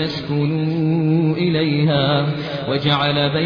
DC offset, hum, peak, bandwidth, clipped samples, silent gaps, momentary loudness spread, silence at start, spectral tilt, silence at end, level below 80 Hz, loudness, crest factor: under 0.1%; none; -4 dBFS; 5.2 kHz; under 0.1%; none; 5 LU; 0 s; -8.5 dB/octave; 0 s; -50 dBFS; -18 LUFS; 14 dB